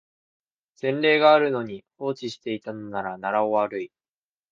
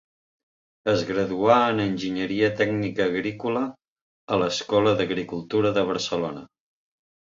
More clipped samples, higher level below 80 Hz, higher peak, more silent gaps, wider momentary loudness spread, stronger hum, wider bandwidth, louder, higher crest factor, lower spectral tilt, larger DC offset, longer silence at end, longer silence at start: neither; second, -70 dBFS vs -60 dBFS; about the same, -4 dBFS vs -4 dBFS; second, none vs 3.88-3.96 s, 4.02-4.28 s; first, 15 LU vs 9 LU; neither; about the same, 7.4 kHz vs 7.6 kHz; about the same, -24 LUFS vs -24 LUFS; about the same, 22 dB vs 22 dB; about the same, -6 dB/octave vs -5.5 dB/octave; neither; second, 0.65 s vs 0.9 s; about the same, 0.85 s vs 0.85 s